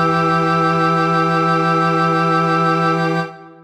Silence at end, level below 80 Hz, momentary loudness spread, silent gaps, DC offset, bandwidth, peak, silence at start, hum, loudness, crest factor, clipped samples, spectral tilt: 0.15 s; -54 dBFS; 3 LU; none; under 0.1%; 9.6 kHz; -4 dBFS; 0 s; none; -15 LUFS; 10 dB; under 0.1%; -6.5 dB/octave